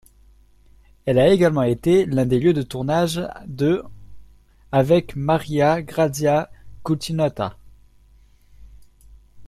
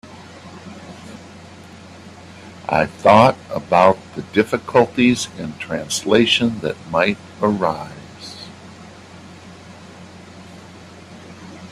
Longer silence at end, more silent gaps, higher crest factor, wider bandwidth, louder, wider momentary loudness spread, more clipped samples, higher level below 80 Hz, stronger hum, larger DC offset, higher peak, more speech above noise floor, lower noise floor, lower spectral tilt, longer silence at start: about the same, 0 s vs 0 s; neither; about the same, 18 dB vs 20 dB; about the same, 14.5 kHz vs 13.5 kHz; second, -20 LUFS vs -17 LUFS; second, 11 LU vs 26 LU; neither; first, -48 dBFS vs -54 dBFS; neither; neither; second, -4 dBFS vs 0 dBFS; first, 33 dB vs 23 dB; first, -52 dBFS vs -40 dBFS; first, -6.5 dB/octave vs -4.5 dB/octave; first, 1.05 s vs 0.05 s